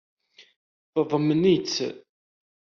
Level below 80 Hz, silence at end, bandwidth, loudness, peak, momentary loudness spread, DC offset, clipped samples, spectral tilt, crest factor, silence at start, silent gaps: -66 dBFS; 0.75 s; 7.2 kHz; -24 LUFS; -10 dBFS; 9 LU; under 0.1%; under 0.1%; -5.5 dB/octave; 18 dB; 0.95 s; none